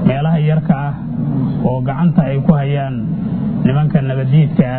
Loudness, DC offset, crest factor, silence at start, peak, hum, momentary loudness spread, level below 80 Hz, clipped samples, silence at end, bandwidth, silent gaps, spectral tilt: -15 LUFS; under 0.1%; 14 dB; 0 s; 0 dBFS; none; 6 LU; -38 dBFS; under 0.1%; 0 s; 4.1 kHz; none; -13.5 dB/octave